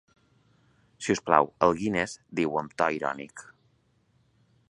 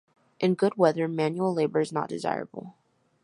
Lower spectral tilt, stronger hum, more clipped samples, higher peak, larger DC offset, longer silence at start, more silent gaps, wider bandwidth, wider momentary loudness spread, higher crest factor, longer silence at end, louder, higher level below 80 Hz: second, -5 dB/octave vs -7 dB/octave; neither; neither; first, -2 dBFS vs -6 dBFS; neither; first, 1 s vs 0.4 s; neither; about the same, 11.5 kHz vs 11 kHz; first, 14 LU vs 10 LU; first, 26 dB vs 20 dB; first, 1.3 s vs 0.55 s; about the same, -27 LUFS vs -27 LUFS; first, -62 dBFS vs -76 dBFS